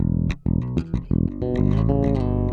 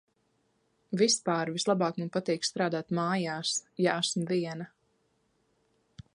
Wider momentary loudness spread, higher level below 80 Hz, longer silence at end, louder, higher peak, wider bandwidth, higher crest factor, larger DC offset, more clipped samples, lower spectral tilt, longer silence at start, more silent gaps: about the same, 5 LU vs 7 LU; first, -30 dBFS vs -74 dBFS; second, 0 s vs 0.15 s; first, -23 LUFS vs -30 LUFS; first, -6 dBFS vs -12 dBFS; second, 6.8 kHz vs 11.5 kHz; second, 14 dB vs 20 dB; neither; neither; first, -10 dB/octave vs -4 dB/octave; second, 0 s vs 0.9 s; neither